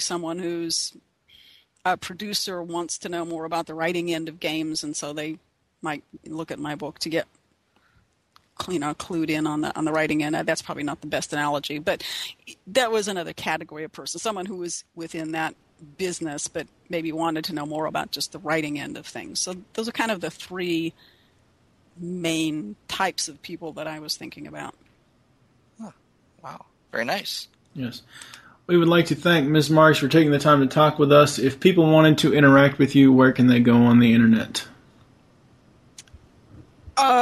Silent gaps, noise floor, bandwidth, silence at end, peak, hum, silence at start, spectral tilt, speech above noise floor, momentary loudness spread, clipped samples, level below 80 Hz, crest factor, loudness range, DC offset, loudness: none; -65 dBFS; 13.5 kHz; 0 s; -2 dBFS; none; 0 s; -5 dB/octave; 43 dB; 19 LU; under 0.1%; -60 dBFS; 20 dB; 16 LU; under 0.1%; -22 LUFS